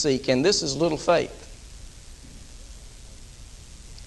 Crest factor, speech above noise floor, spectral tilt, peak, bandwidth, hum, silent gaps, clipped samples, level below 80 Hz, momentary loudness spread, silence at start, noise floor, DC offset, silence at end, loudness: 20 dB; 21 dB; -4 dB/octave; -6 dBFS; 12 kHz; none; none; under 0.1%; -46 dBFS; 24 LU; 0 s; -44 dBFS; under 0.1%; 0 s; -23 LUFS